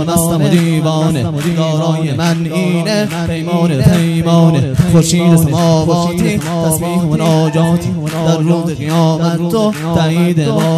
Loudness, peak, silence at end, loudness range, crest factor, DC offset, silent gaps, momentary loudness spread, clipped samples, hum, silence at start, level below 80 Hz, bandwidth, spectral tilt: -12 LUFS; 0 dBFS; 0 s; 3 LU; 12 dB; under 0.1%; none; 5 LU; 0.3%; none; 0 s; -38 dBFS; 14.5 kHz; -6 dB/octave